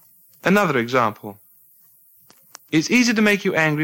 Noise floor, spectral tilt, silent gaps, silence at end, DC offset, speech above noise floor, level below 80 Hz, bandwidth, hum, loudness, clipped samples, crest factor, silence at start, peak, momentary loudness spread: -53 dBFS; -4.5 dB/octave; none; 0 s; under 0.1%; 35 dB; -62 dBFS; 17 kHz; none; -18 LUFS; under 0.1%; 18 dB; 0.45 s; -2 dBFS; 9 LU